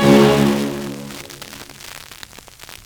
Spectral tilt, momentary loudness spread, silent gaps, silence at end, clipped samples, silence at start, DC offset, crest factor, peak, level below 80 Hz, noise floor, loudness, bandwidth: -5.5 dB/octave; 25 LU; none; 0.1 s; under 0.1%; 0 s; under 0.1%; 18 dB; 0 dBFS; -44 dBFS; -40 dBFS; -16 LUFS; over 20 kHz